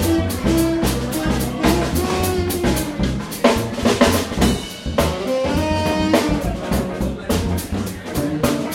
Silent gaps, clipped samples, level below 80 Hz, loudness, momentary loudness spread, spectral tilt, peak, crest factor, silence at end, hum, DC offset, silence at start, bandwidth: none; under 0.1%; -30 dBFS; -19 LUFS; 6 LU; -5 dB/octave; 0 dBFS; 18 dB; 0 s; none; under 0.1%; 0 s; 16.5 kHz